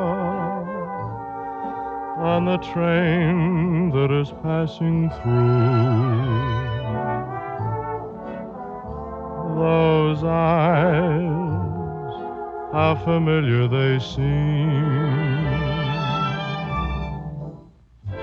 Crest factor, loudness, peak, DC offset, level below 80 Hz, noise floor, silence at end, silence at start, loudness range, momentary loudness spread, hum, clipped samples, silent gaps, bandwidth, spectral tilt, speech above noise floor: 16 dB; -22 LUFS; -6 dBFS; under 0.1%; -40 dBFS; -47 dBFS; 0 s; 0 s; 4 LU; 13 LU; none; under 0.1%; none; 6.6 kHz; -9 dB/octave; 27 dB